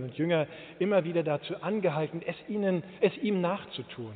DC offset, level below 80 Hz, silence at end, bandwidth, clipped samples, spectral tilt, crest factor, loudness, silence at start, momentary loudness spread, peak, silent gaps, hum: under 0.1%; -72 dBFS; 0 s; 4.6 kHz; under 0.1%; -5.5 dB/octave; 18 dB; -30 LUFS; 0 s; 9 LU; -12 dBFS; none; none